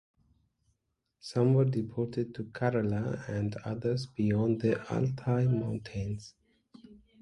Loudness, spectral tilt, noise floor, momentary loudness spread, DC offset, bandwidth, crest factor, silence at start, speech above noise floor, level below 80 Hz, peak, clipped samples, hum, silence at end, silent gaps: -31 LUFS; -8.5 dB/octave; -80 dBFS; 10 LU; under 0.1%; 11 kHz; 18 dB; 1.25 s; 50 dB; -58 dBFS; -14 dBFS; under 0.1%; none; 0.3 s; none